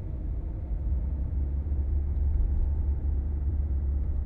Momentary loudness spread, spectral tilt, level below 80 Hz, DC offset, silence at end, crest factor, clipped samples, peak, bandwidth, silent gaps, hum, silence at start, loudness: 6 LU; -12.5 dB/octave; -28 dBFS; under 0.1%; 0 s; 12 dB; under 0.1%; -16 dBFS; 2.1 kHz; none; none; 0 s; -31 LUFS